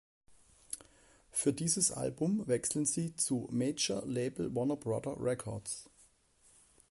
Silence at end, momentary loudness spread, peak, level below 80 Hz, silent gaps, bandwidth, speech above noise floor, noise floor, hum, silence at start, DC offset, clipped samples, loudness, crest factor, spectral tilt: 1.05 s; 11 LU; -16 dBFS; -66 dBFS; none; 12 kHz; 33 dB; -67 dBFS; none; 0.3 s; under 0.1%; under 0.1%; -34 LUFS; 20 dB; -4 dB/octave